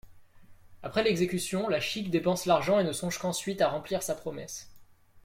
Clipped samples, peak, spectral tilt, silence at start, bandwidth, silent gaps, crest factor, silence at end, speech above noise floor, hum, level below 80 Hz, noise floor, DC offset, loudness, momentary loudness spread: under 0.1%; -12 dBFS; -4.5 dB/octave; 0.05 s; 16.5 kHz; none; 18 dB; 0.05 s; 26 dB; none; -60 dBFS; -55 dBFS; under 0.1%; -29 LUFS; 12 LU